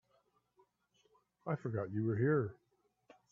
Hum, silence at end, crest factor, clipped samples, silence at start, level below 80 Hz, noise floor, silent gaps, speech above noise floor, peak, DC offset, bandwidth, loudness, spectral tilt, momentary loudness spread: 60 Hz at -60 dBFS; 0.8 s; 18 dB; under 0.1%; 1.45 s; -78 dBFS; -76 dBFS; none; 41 dB; -22 dBFS; under 0.1%; 6.8 kHz; -37 LUFS; -11 dB/octave; 11 LU